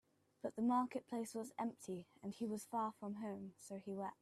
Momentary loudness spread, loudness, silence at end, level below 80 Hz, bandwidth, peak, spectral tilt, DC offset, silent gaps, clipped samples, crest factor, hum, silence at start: 13 LU; -45 LUFS; 0.1 s; -86 dBFS; 14 kHz; -28 dBFS; -6 dB/octave; under 0.1%; none; under 0.1%; 18 dB; none; 0.45 s